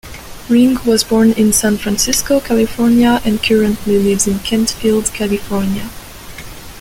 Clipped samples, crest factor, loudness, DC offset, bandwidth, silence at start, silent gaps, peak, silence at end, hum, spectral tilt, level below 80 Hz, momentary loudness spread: under 0.1%; 14 dB; -13 LUFS; under 0.1%; 17 kHz; 0.05 s; none; 0 dBFS; 0 s; none; -4 dB/octave; -34 dBFS; 20 LU